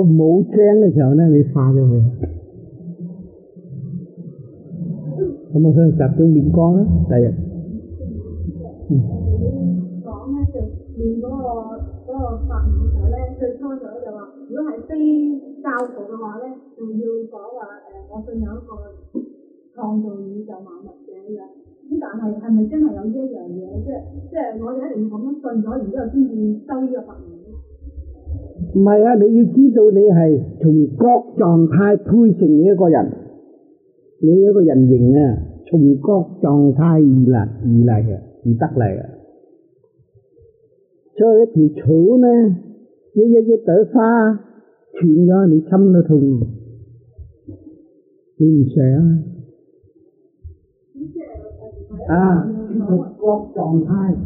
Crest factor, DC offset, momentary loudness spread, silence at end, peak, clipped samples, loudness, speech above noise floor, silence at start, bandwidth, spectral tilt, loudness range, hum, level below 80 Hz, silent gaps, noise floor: 14 dB; under 0.1%; 21 LU; 0 s; -2 dBFS; under 0.1%; -15 LUFS; 41 dB; 0 s; 2.7 kHz; -8.5 dB/octave; 13 LU; none; -34 dBFS; none; -56 dBFS